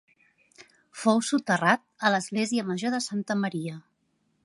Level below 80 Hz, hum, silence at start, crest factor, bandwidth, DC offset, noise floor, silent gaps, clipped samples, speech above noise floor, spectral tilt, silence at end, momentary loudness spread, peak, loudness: -78 dBFS; none; 0.6 s; 22 dB; 11.5 kHz; under 0.1%; -72 dBFS; none; under 0.1%; 46 dB; -4.5 dB/octave; 0.65 s; 11 LU; -6 dBFS; -26 LUFS